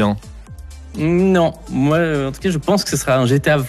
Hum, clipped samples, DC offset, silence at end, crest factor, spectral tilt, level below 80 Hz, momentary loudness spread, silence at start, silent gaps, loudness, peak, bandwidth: none; under 0.1%; under 0.1%; 0 s; 14 dB; -6 dB/octave; -38 dBFS; 21 LU; 0 s; none; -17 LUFS; -4 dBFS; 13.5 kHz